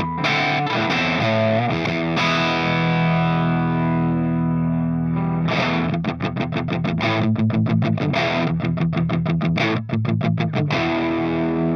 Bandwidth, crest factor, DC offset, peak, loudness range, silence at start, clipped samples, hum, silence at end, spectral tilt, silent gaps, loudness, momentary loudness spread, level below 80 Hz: 6.6 kHz; 14 dB; under 0.1%; -6 dBFS; 2 LU; 0 s; under 0.1%; none; 0 s; -7 dB/octave; none; -20 LUFS; 3 LU; -50 dBFS